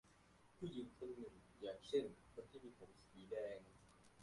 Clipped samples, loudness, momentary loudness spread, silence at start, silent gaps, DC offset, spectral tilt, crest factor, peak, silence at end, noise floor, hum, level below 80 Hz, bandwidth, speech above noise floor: under 0.1%; -51 LUFS; 20 LU; 0.05 s; none; under 0.1%; -6 dB/octave; 22 dB; -30 dBFS; 0 s; -71 dBFS; 60 Hz at -75 dBFS; -76 dBFS; 11.5 kHz; 21 dB